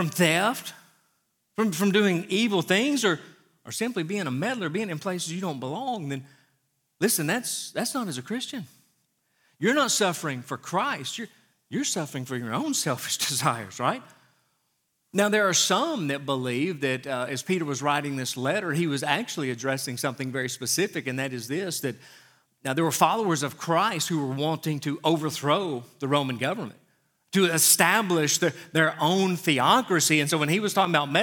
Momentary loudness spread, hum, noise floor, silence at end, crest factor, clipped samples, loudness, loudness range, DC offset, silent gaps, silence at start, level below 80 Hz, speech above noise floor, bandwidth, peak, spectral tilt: 11 LU; none; -74 dBFS; 0 s; 24 dB; under 0.1%; -25 LUFS; 7 LU; under 0.1%; none; 0 s; -80 dBFS; 48 dB; 19 kHz; -2 dBFS; -3.5 dB/octave